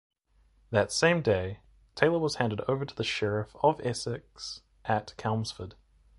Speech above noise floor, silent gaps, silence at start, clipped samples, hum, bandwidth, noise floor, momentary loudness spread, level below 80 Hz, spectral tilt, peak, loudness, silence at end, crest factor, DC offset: 37 dB; none; 0.7 s; under 0.1%; none; 11.5 kHz; -66 dBFS; 15 LU; -56 dBFS; -5 dB/octave; -4 dBFS; -29 LUFS; 0.45 s; 26 dB; under 0.1%